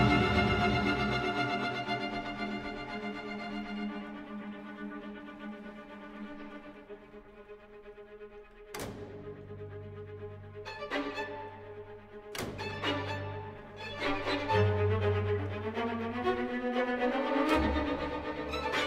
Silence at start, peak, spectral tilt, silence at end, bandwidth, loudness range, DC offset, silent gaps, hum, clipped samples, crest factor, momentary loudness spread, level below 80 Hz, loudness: 0 s; -14 dBFS; -6 dB/octave; 0 s; 16 kHz; 15 LU; under 0.1%; none; none; under 0.1%; 20 dB; 20 LU; -50 dBFS; -33 LUFS